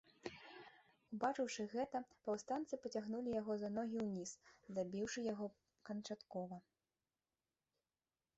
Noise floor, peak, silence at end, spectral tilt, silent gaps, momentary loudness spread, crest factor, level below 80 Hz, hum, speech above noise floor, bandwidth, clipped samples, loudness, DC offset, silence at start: under -90 dBFS; -26 dBFS; 1.8 s; -5 dB/octave; none; 14 LU; 20 dB; -80 dBFS; none; over 46 dB; 8 kHz; under 0.1%; -45 LUFS; under 0.1%; 0.25 s